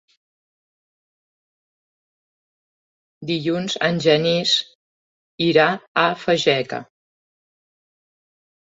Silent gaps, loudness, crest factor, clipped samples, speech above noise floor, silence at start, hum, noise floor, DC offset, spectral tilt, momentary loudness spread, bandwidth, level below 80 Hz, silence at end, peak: 4.75-5.38 s, 5.88-5.95 s; -19 LUFS; 22 dB; under 0.1%; over 71 dB; 3.2 s; none; under -90 dBFS; under 0.1%; -4.5 dB/octave; 12 LU; 8 kHz; -66 dBFS; 1.9 s; -2 dBFS